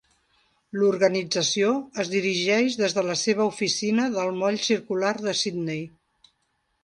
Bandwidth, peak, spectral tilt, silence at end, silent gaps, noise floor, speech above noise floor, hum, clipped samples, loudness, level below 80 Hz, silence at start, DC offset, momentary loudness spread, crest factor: 11 kHz; -8 dBFS; -3.5 dB/octave; 0.95 s; none; -73 dBFS; 49 dB; none; under 0.1%; -24 LUFS; -70 dBFS; 0.75 s; under 0.1%; 6 LU; 18 dB